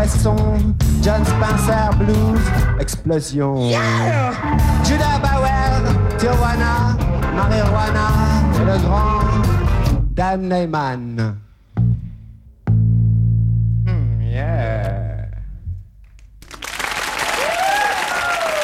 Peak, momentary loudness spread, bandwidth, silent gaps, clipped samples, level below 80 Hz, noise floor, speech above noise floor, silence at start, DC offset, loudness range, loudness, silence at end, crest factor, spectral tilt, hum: -2 dBFS; 8 LU; 15.5 kHz; none; under 0.1%; -22 dBFS; -42 dBFS; 27 dB; 0 s; under 0.1%; 5 LU; -17 LUFS; 0 s; 14 dB; -6 dB/octave; none